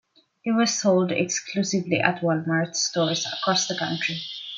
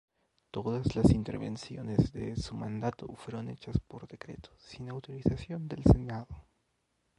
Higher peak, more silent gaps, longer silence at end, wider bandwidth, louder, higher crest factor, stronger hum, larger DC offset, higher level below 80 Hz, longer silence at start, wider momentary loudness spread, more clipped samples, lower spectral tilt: first, -2 dBFS vs -6 dBFS; neither; second, 0 s vs 0.8 s; second, 9.2 kHz vs 11.5 kHz; first, -23 LUFS vs -33 LUFS; about the same, 22 dB vs 26 dB; neither; neither; second, -70 dBFS vs -42 dBFS; about the same, 0.45 s vs 0.55 s; second, 5 LU vs 20 LU; neither; second, -3.5 dB/octave vs -8 dB/octave